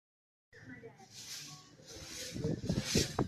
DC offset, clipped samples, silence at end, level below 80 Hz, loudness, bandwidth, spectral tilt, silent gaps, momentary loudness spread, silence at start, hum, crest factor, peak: under 0.1%; under 0.1%; 0 s; -56 dBFS; -38 LUFS; 15.5 kHz; -4 dB/octave; none; 20 LU; 0.55 s; none; 24 dB; -16 dBFS